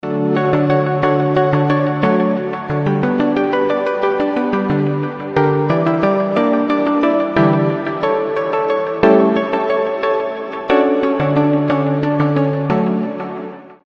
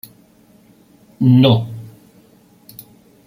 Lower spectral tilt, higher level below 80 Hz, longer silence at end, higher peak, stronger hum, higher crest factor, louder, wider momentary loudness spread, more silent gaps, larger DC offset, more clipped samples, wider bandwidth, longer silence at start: about the same, -9 dB/octave vs -8 dB/octave; first, -50 dBFS vs -56 dBFS; second, 0.1 s vs 1.4 s; about the same, 0 dBFS vs -2 dBFS; neither; about the same, 16 dB vs 18 dB; about the same, -16 LUFS vs -14 LUFS; second, 5 LU vs 28 LU; neither; neither; neither; second, 6.4 kHz vs 16.5 kHz; second, 0.05 s vs 1.2 s